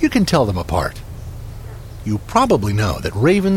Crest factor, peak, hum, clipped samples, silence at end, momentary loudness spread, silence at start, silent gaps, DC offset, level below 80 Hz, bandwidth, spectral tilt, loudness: 16 dB; -2 dBFS; none; under 0.1%; 0 s; 18 LU; 0 s; none; under 0.1%; -34 dBFS; 16.5 kHz; -6 dB/octave; -18 LUFS